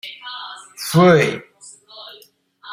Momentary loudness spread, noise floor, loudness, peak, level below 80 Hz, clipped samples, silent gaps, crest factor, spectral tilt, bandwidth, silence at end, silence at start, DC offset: 26 LU; -50 dBFS; -15 LUFS; -2 dBFS; -60 dBFS; under 0.1%; none; 18 dB; -5.5 dB/octave; 16 kHz; 0 s; 0.05 s; under 0.1%